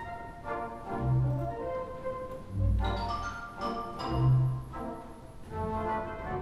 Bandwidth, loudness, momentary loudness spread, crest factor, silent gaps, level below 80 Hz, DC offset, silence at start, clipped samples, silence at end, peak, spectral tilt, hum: 11.5 kHz; -33 LUFS; 13 LU; 16 dB; none; -40 dBFS; under 0.1%; 0 s; under 0.1%; 0 s; -16 dBFS; -8 dB/octave; none